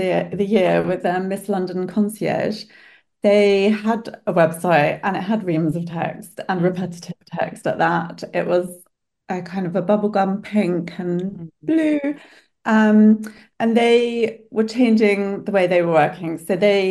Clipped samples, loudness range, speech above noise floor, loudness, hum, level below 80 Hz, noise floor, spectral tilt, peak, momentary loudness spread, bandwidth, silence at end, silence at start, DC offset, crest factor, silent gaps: under 0.1%; 6 LU; 34 dB; -19 LUFS; none; -62 dBFS; -53 dBFS; -6.5 dB/octave; -2 dBFS; 12 LU; 12.5 kHz; 0 s; 0 s; under 0.1%; 16 dB; none